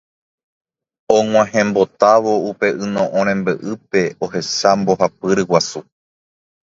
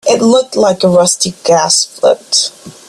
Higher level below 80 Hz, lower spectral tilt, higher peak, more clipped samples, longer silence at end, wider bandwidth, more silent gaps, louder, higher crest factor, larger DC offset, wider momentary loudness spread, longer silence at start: about the same, -56 dBFS vs -52 dBFS; first, -4.5 dB/octave vs -3 dB/octave; about the same, 0 dBFS vs 0 dBFS; neither; first, 0.85 s vs 0.15 s; second, 7.8 kHz vs 13.5 kHz; neither; second, -16 LUFS vs -10 LUFS; first, 18 dB vs 12 dB; neither; first, 8 LU vs 4 LU; first, 1.1 s vs 0.05 s